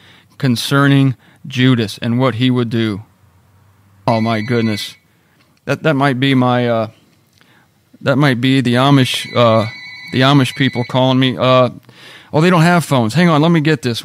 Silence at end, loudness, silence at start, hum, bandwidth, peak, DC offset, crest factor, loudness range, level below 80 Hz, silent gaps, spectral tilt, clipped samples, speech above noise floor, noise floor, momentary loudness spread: 0 s; -14 LUFS; 0.4 s; none; 15.5 kHz; 0 dBFS; under 0.1%; 14 dB; 5 LU; -58 dBFS; none; -6.5 dB/octave; under 0.1%; 40 dB; -54 dBFS; 11 LU